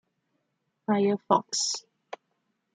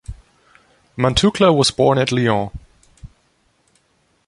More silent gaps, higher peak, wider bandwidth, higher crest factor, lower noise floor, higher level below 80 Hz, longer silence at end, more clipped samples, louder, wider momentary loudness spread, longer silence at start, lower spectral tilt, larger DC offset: neither; second, -6 dBFS vs 0 dBFS; second, 9.6 kHz vs 11.5 kHz; first, 24 dB vs 18 dB; first, -78 dBFS vs -62 dBFS; second, -80 dBFS vs -40 dBFS; second, 0.95 s vs 1.2 s; neither; second, -27 LUFS vs -16 LUFS; first, 21 LU vs 17 LU; first, 0.9 s vs 0.1 s; second, -3.5 dB/octave vs -5 dB/octave; neither